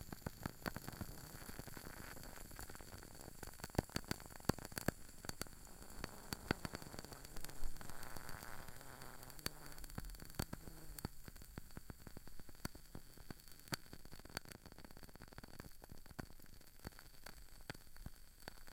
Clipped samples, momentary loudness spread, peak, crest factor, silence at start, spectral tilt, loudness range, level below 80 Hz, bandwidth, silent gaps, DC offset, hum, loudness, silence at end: under 0.1%; 14 LU; -18 dBFS; 32 dB; 0 s; -4 dB/octave; 9 LU; -56 dBFS; 17 kHz; none; under 0.1%; none; -51 LUFS; 0 s